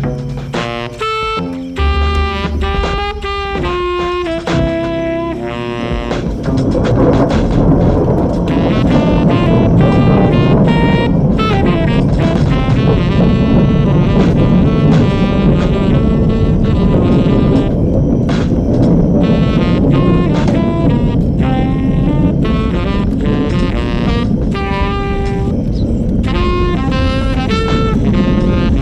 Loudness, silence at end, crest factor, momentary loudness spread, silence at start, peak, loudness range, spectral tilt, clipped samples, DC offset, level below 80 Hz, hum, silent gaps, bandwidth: -13 LUFS; 0 s; 12 dB; 7 LU; 0 s; 0 dBFS; 6 LU; -8 dB/octave; under 0.1%; under 0.1%; -20 dBFS; none; none; 9 kHz